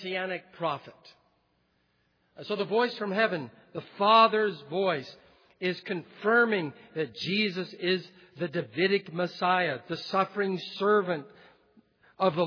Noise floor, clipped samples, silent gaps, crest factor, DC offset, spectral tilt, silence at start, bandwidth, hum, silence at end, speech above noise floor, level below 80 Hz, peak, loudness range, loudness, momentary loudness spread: -72 dBFS; under 0.1%; none; 22 dB; under 0.1%; -6.5 dB/octave; 0 s; 5.4 kHz; none; 0 s; 43 dB; -80 dBFS; -8 dBFS; 6 LU; -28 LUFS; 13 LU